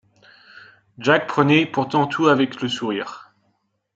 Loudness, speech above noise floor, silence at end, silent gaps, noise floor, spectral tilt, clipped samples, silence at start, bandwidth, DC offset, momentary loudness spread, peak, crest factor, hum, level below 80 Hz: -19 LUFS; 50 dB; 0.75 s; none; -69 dBFS; -6 dB/octave; under 0.1%; 1 s; 8 kHz; under 0.1%; 9 LU; -2 dBFS; 20 dB; none; -66 dBFS